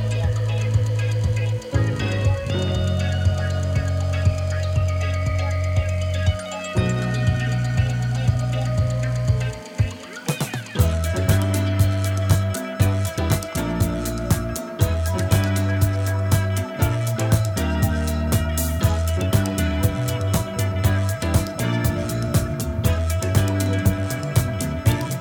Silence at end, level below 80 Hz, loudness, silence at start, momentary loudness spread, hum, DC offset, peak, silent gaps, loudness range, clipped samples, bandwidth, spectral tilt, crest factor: 0 s; -32 dBFS; -22 LUFS; 0 s; 4 LU; none; under 0.1%; -4 dBFS; none; 1 LU; under 0.1%; over 20 kHz; -6 dB/octave; 18 dB